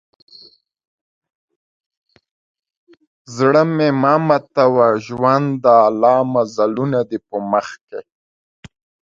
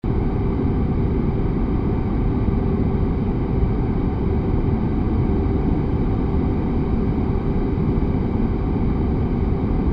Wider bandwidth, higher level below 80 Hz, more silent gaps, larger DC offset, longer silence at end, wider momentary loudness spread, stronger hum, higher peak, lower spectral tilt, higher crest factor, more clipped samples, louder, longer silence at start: first, 7.6 kHz vs 5.2 kHz; second, -62 dBFS vs -24 dBFS; first, 7.81-7.87 s vs none; neither; first, 1.2 s vs 0 s; first, 13 LU vs 1 LU; neither; first, 0 dBFS vs -8 dBFS; second, -7 dB/octave vs -11.5 dB/octave; first, 18 dB vs 12 dB; neither; first, -15 LUFS vs -21 LUFS; first, 3.3 s vs 0.05 s